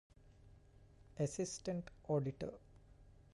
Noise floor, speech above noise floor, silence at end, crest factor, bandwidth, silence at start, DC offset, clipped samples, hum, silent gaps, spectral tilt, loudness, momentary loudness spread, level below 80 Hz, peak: -64 dBFS; 23 dB; 0.1 s; 18 dB; 11.5 kHz; 0.25 s; under 0.1%; under 0.1%; none; none; -6 dB/octave; -43 LUFS; 12 LU; -66 dBFS; -26 dBFS